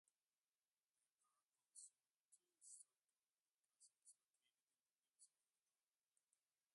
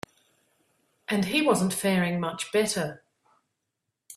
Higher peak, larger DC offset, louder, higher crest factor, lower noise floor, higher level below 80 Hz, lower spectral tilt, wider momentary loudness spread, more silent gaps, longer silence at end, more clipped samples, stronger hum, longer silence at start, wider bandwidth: second, -48 dBFS vs -10 dBFS; neither; second, -66 LUFS vs -26 LUFS; first, 28 dB vs 20 dB; first, under -90 dBFS vs -82 dBFS; second, under -90 dBFS vs -66 dBFS; second, 3 dB/octave vs -4.5 dB/octave; second, 4 LU vs 11 LU; first, 2.20-2.29 s, 3.04-3.08 s, 3.40-3.45 s, 3.51-3.55 s, 4.30-4.34 s, 4.62-4.67 s, 4.81-4.85 s, 4.97-5.03 s vs none; first, 1.45 s vs 0 s; neither; neither; about the same, 1.2 s vs 1.1 s; second, 11 kHz vs 15 kHz